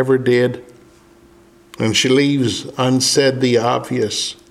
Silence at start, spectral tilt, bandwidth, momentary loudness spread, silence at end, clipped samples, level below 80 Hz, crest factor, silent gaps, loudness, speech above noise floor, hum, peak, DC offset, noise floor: 0 s; -4 dB/octave; 15 kHz; 7 LU; 0.15 s; under 0.1%; -56 dBFS; 16 dB; none; -16 LUFS; 31 dB; none; -2 dBFS; under 0.1%; -48 dBFS